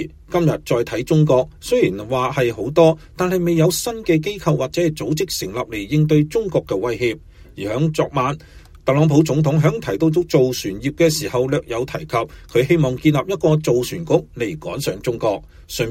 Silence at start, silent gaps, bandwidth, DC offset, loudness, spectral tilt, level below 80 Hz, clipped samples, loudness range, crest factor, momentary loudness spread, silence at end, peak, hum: 0 s; none; 16.5 kHz; under 0.1%; -19 LUFS; -6 dB/octave; -44 dBFS; under 0.1%; 3 LU; 16 dB; 9 LU; 0 s; -2 dBFS; none